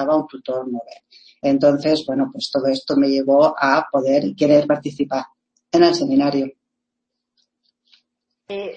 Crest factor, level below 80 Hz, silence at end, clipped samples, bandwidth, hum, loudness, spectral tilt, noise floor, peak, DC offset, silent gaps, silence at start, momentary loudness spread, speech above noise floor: 18 dB; -62 dBFS; 0 s; under 0.1%; 8.6 kHz; none; -18 LUFS; -5.5 dB/octave; -80 dBFS; -2 dBFS; under 0.1%; none; 0 s; 12 LU; 62 dB